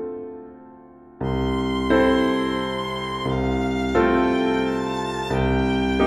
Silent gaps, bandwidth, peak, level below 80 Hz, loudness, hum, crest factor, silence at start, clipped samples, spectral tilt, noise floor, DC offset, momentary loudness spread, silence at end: none; 12 kHz; -6 dBFS; -36 dBFS; -22 LUFS; none; 16 dB; 0 s; under 0.1%; -6.5 dB/octave; -46 dBFS; under 0.1%; 12 LU; 0 s